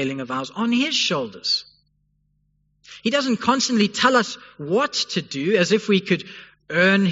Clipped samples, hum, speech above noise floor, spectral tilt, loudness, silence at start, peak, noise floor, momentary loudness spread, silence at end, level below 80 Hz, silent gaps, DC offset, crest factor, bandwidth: under 0.1%; 50 Hz at -50 dBFS; 46 dB; -3 dB/octave; -21 LUFS; 0 s; -2 dBFS; -67 dBFS; 10 LU; 0 s; -66 dBFS; none; under 0.1%; 18 dB; 8 kHz